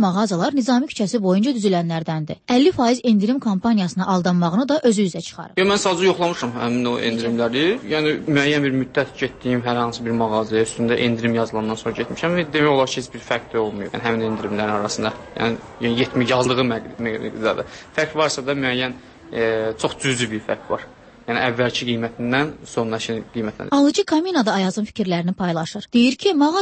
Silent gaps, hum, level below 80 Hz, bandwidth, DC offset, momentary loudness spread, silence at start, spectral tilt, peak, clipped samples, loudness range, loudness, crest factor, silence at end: none; none; -54 dBFS; 8.8 kHz; under 0.1%; 8 LU; 0 s; -5 dB/octave; -4 dBFS; under 0.1%; 4 LU; -20 LUFS; 16 dB; 0 s